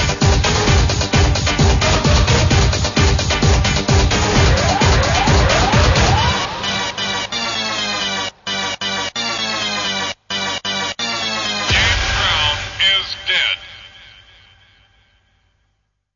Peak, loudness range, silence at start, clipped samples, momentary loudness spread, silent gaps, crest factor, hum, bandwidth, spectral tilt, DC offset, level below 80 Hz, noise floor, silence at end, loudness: -2 dBFS; 5 LU; 0 s; under 0.1%; 7 LU; none; 16 dB; none; 7.4 kHz; -3.5 dB/octave; under 0.1%; -24 dBFS; -67 dBFS; 2.3 s; -16 LUFS